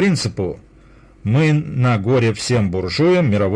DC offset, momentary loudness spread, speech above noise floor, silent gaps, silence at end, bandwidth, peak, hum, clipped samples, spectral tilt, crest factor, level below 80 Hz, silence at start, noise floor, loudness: under 0.1%; 10 LU; 30 dB; none; 0 s; 10.5 kHz; -6 dBFS; none; under 0.1%; -6.5 dB/octave; 10 dB; -46 dBFS; 0 s; -46 dBFS; -17 LUFS